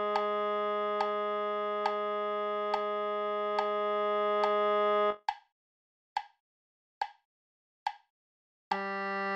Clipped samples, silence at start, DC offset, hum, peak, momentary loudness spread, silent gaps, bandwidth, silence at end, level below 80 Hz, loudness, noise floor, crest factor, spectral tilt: under 0.1%; 0 s; under 0.1%; none; -16 dBFS; 12 LU; 5.52-6.16 s, 6.40-7.01 s, 7.25-7.86 s, 8.10-8.71 s; 8.4 kHz; 0 s; -80 dBFS; -32 LUFS; under -90 dBFS; 18 dB; -5 dB/octave